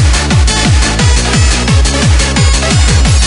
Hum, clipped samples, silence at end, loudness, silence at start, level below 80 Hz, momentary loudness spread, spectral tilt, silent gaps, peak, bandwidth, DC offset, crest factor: none; under 0.1%; 0 s; -9 LUFS; 0 s; -12 dBFS; 1 LU; -4 dB/octave; none; 0 dBFS; 11 kHz; under 0.1%; 8 dB